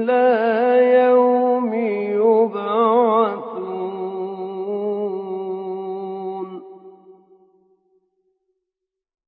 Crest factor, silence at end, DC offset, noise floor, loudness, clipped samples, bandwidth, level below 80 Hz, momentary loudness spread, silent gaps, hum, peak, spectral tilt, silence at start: 16 dB; 2.15 s; under 0.1%; -83 dBFS; -19 LUFS; under 0.1%; 4.8 kHz; -84 dBFS; 14 LU; none; none; -4 dBFS; -10.5 dB/octave; 0 s